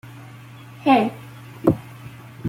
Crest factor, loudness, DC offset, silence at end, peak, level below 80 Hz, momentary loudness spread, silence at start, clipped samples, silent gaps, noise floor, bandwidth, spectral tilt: 22 dB; -21 LUFS; under 0.1%; 0 s; -2 dBFS; -56 dBFS; 24 LU; 0.05 s; under 0.1%; none; -41 dBFS; 16.5 kHz; -7.5 dB/octave